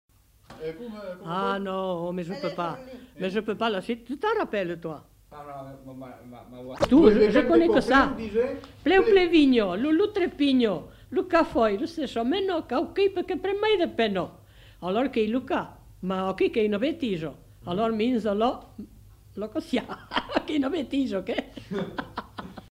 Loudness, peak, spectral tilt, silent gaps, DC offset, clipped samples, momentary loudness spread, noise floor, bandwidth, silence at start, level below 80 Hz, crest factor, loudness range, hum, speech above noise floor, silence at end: -25 LUFS; -4 dBFS; -6.5 dB/octave; none; under 0.1%; under 0.1%; 21 LU; -51 dBFS; 15 kHz; 0.5 s; -50 dBFS; 22 dB; 9 LU; none; 26 dB; 0.1 s